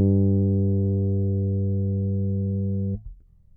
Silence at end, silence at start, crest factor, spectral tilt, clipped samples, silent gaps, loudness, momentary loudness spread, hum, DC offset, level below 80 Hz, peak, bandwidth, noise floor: 0.4 s; 0 s; 14 dB; -19 dB/octave; under 0.1%; none; -24 LUFS; 6 LU; 50 Hz at -60 dBFS; under 0.1%; -50 dBFS; -10 dBFS; 0.9 kHz; -44 dBFS